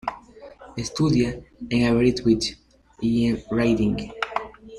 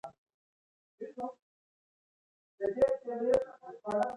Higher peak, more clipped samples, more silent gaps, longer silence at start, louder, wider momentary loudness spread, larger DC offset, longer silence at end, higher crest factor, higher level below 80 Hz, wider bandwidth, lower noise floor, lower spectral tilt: first, -6 dBFS vs -16 dBFS; neither; second, none vs 0.18-0.26 s, 0.34-0.98 s, 1.42-2.58 s; about the same, 0.05 s vs 0.05 s; first, -23 LUFS vs -33 LUFS; second, 13 LU vs 16 LU; neither; about the same, 0 s vs 0 s; about the same, 16 dB vs 20 dB; first, -44 dBFS vs -68 dBFS; about the same, 11.5 kHz vs 11 kHz; second, -45 dBFS vs under -90 dBFS; about the same, -6 dB/octave vs -6.5 dB/octave